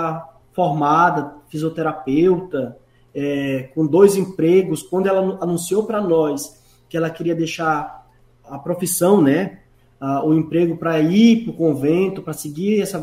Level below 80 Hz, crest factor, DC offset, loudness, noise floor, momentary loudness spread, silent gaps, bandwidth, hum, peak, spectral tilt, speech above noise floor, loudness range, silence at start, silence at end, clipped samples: -56 dBFS; 18 dB; under 0.1%; -18 LUFS; -49 dBFS; 14 LU; none; 16 kHz; none; 0 dBFS; -6 dB/octave; 32 dB; 4 LU; 0 s; 0 s; under 0.1%